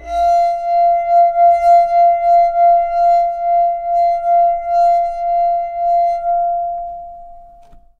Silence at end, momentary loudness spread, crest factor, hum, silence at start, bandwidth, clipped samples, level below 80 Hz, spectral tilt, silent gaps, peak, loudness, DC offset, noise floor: 0.55 s; 7 LU; 12 dB; none; 0 s; 6.6 kHz; under 0.1%; -42 dBFS; -4 dB/octave; none; -2 dBFS; -14 LUFS; under 0.1%; -42 dBFS